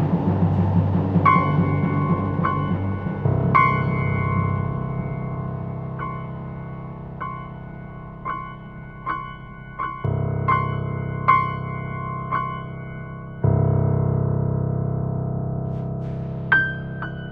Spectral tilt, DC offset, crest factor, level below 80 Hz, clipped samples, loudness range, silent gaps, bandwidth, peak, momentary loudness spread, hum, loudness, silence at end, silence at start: -10.5 dB/octave; under 0.1%; 20 dB; -42 dBFS; under 0.1%; 12 LU; none; 4.8 kHz; -4 dBFS; 15 LU; none; -23 LUFS; 0 s; 0 s